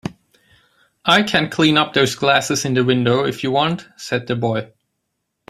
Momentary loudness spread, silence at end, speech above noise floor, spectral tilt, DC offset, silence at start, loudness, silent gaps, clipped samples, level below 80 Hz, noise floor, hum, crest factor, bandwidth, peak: 10 LU; 0.85 s; 57 dB; -4.5 dB/octave; under 0.1%; 0.05 s; -17 LUFS; none; under 0.1%; -56 dBFS; -75 dBFS; none; 18 dB; 15.5 kHz; -2 dBFS